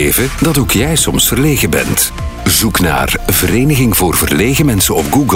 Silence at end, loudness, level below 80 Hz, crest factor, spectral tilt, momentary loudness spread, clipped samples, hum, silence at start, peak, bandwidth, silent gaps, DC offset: 0 s; -11 LUFS; -24 dBFS; 12 dB; -4 dB/octave; 2 LU; under 0.1%; none; 0 s; 0 dBFS; 16.5 kHz; none; under 0.1%